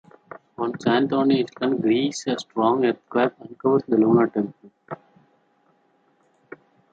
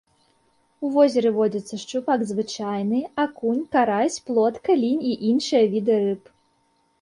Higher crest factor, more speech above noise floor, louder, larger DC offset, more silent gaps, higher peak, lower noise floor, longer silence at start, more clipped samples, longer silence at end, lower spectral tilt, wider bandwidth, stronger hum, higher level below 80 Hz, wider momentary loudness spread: about the same, 18 dB vs 16 dB; about the same, 42 dB vs 44 dB; about the same, -22 LUFS vs -22 LUFS; neither; neither; about the same, -6 dBFS vs -6 dBFS; about the same, -63 dBFS vs -66 dBFS; second, 0.6 s vs 0.8 s; neither; first, 1.95 s vs 0.85 s; about the same, -6 dB/octave vs -5.5 dB/octave; second, 9 kHz vs 11 kHz; neither; about the same, -70 dBFS vs -68 dBFS; first, 16 LU vs 8 LU